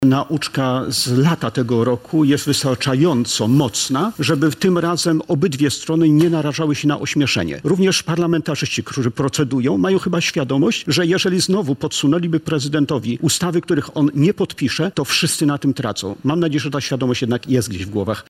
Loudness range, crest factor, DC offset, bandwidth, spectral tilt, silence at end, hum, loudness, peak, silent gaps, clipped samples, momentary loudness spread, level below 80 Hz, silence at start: 2 LU; 14 dB; under 0.1%; 16 kHz; -5 dB/octave; 0.1 s; none; -18 LUFS; -4 dBFS; none; under 0.1%; 5 LU; -52 dBFS; 0 s